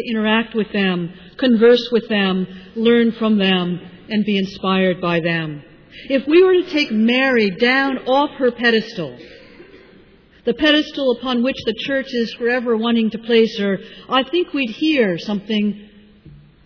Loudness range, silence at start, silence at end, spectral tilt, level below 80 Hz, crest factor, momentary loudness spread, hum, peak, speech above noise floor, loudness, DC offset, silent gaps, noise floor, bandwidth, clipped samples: 4 LU; 0 s; 0.3 s; -6.5 dB/octave; -54 dBFS; 14 dB; 9 LU; none; -4 dBFS; 31 dB; -17 LUFS; under 0.1%; none; -48 dBFS; 5.4 kHz; under 0.1%